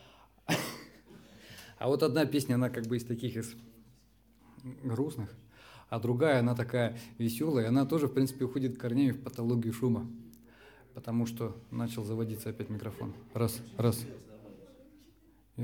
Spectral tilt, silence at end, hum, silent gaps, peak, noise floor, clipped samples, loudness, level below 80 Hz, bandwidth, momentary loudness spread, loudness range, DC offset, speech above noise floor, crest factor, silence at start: -6.5 dB/octave; 0 s; none; none; -14 dBFS; -64 dBFS; under 0.1%; -33 LUFS; -66 dBFS; 19 kHz; 21 LU; 7 LU; under 0.1%; 32 dB; 20 dB; 0.45 s